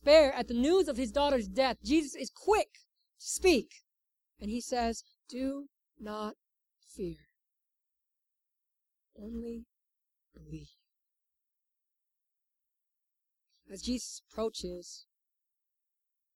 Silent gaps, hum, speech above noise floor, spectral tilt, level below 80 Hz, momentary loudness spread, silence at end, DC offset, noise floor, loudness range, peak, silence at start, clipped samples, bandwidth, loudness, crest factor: none; none; 56 dB; -3.5 dB/octave; -56 dBFS; 21 LU; 1.35 s; under 0.1%; -87 dBFS; 18 LU; -12 dBFS; 0.05 s; under 0.1%; 16 kHz; -32 LUFS; 22 dB